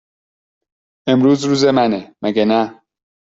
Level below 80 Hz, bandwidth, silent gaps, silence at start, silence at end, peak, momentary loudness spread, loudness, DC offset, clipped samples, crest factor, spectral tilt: -58 dBFS; 8 kHz; none; 1.05 s; 0.65 s; -2 dBFS; 9 LU; -16 LUFS; under 0.1%; under 0.1%; 14 dB; -6 dB/octave